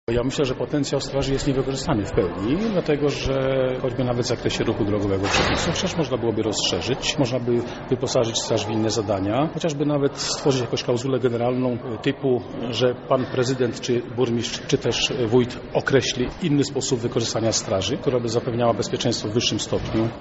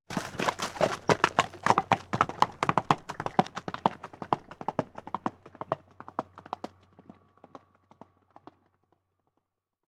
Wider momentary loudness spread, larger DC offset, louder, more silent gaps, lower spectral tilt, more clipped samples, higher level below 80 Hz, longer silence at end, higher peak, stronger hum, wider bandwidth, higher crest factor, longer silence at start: second, 4 LU vs 14 LU; neither; first, -23 LUFS vs -30 LUFS; neither; about the same, -4.5 dB/octave vs -4.5 dB/octave; neither; first, -42 dBFS vs -64 dBFS; second, 0 s vs 3.2 s; about the same, -4 dBFS vs -4 dBFS; neither; second, 8 kHz vs 17 kHz; second, 18 dB vs 28 dB; about the same, 0.1 s vs 0.1 s